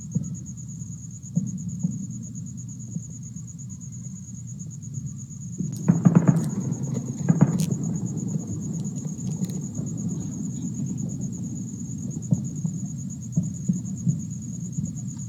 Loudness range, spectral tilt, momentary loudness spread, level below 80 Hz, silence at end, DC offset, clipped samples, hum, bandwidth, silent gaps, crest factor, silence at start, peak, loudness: 11 LU; -7 dB/octave; 15 LU; -56 dBFS; 0 s; under 0.1%; under 0.1%; none; 13.5 kHz; none; 26 dB; 0 s; -2 dBFS; -28 LUFS